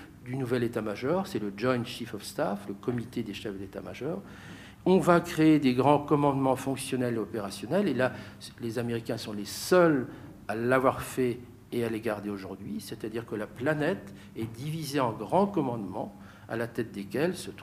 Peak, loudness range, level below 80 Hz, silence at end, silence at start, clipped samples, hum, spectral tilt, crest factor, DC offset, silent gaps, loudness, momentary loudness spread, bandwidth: -8 dBFS; 8 LU; -60 dBFS; 0 s; 0 s; under 0.1%; none; -6 dB/octave; 22 dB; under 0.1%; none; -29 LUFS; 15 LU; 15.5 kHz